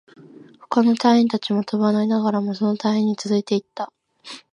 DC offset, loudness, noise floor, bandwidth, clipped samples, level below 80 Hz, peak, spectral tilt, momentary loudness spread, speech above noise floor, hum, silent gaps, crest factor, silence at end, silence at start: under 0.1%; -20 LUFS; -46 dBFS; 10 kHz; under 0.1%; -70 dBFS; -4 dBFS; -6.5 dB/octave; 16 LU; 26 dB; none; none; 18 dB; 0.15 s; 0.4 s